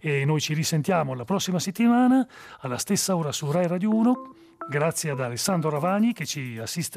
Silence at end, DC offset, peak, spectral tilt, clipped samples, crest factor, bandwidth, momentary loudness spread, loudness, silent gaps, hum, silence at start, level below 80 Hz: 0 s; under 0.1%; -10 dBFS; -5 dB/octave; under 0.1%; 14 dB; 15.5 kHz; 9 LU; -25 LUFS; none; none; 0.05 s; -68 dBFS